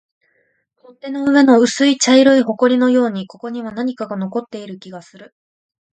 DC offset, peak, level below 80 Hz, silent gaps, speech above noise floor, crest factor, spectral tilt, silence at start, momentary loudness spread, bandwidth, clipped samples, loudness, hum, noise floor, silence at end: under 0.1%; 0 dBFS; -66 dBFS; none; 48 dB; 16 dB; -4 dB/octave; 1.05 s; 21 LU; 9.4 kHz; under 0.1%; -14 LUFS; none; -64 dBFS; 0.7 s